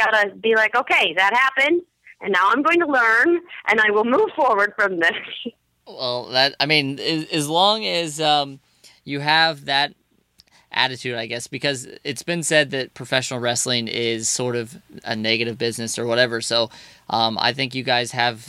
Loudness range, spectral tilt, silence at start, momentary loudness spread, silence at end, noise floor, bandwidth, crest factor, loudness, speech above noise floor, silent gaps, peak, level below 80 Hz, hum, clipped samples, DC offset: 5 LU; -3 dB/octave; 0 s; 11 LU; 0 s; -58 dBFS; 15.5 kHz; 20 dB; -19 LUFS; 38 dB; none; 0 dBFS; -68 dBFS; none; under 0.1%; under 0.1%